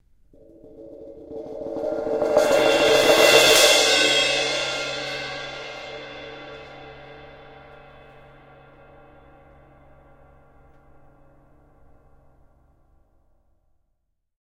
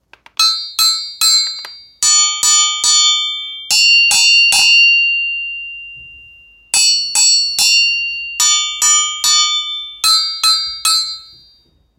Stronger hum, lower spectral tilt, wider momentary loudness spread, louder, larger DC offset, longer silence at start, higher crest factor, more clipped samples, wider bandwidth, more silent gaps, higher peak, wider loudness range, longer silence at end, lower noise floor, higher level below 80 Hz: neither; first, -1 dB/octave vs 5 dB/octave; first, 28 LU vs 15 LU; second, -18 LUFS vs -10 LUFS; neither; first, 0.75 s vs 0.4 s; first, 24 dB vs 14 dB; neither; second, 16 kHz vs 19 kHz; neither; about the same, 0 dBFS vs 0 dBFS; first, 22 LU vs 4 LU; first, 7.1 s vs 0.75 s; first, -73 dBFS vs -53 dBFS; about the same, -54 dBFS vs -54 dBFS